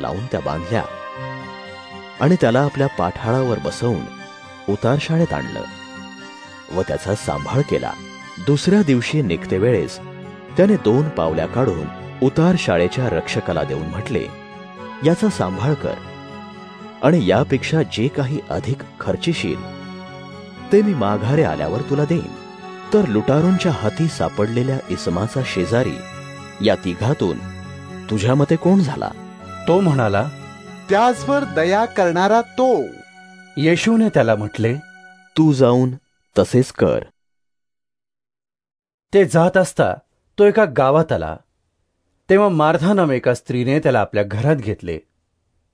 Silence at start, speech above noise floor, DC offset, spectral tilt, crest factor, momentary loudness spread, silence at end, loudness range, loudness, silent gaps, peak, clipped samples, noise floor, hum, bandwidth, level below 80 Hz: 0 s; 73 dB; under 0.1%; -7 dB/octave; 18 dB; 19 LU; 0.75 s; 5 LU; -18 LUFS; 38.94-38.98 s; -2 dBFS; under 0.1%; -90 dBFS; none; 11 kHz; -48 dBFS